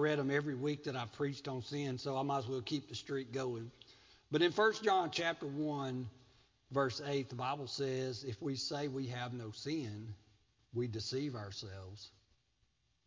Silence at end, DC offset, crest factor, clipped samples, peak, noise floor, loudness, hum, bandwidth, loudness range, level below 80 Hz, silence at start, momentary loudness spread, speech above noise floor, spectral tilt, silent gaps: 1 s; under 0.1%; 20 dB; under 0.1%; -18 dBFS; -78 dBFS; -38 LUFS; none; 7.6 kHz; 7 LU; -70 dBFS; 0 s; 13 LU; 40 dB; -5.5 dB/octave; none